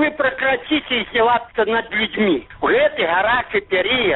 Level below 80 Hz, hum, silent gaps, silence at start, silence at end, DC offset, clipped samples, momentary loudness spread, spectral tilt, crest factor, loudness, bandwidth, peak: -48 dBFS; none; none; 0 s; 0 s; under 0.1%; under 0.1%; 3 LU; -1 dB/octave; 12 dB; -18 LUFS; 4.2 kHz; -6 dBFS